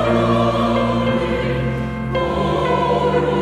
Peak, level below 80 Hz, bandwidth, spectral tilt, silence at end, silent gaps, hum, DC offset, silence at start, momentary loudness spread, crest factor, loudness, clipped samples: -4 dBFS; -34 dBFS; 11.5 kHz; -7.5 dB/octave; 0 s; none; none; under 0.1%; 0 s; 5 LU; 12 dB; -18 LUFS; under 0.1%